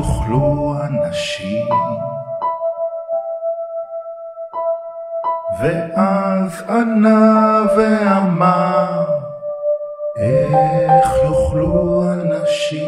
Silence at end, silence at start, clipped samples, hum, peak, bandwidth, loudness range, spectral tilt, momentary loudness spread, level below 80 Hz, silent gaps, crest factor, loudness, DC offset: 0 s; 0 s; under 0.1%; none; -2 dBFS; 13 kHz; 9 LU; -7 dB/octave; 12 LU; -36 dBFS; none; 16 dB; -17 LUFS; under 0.1%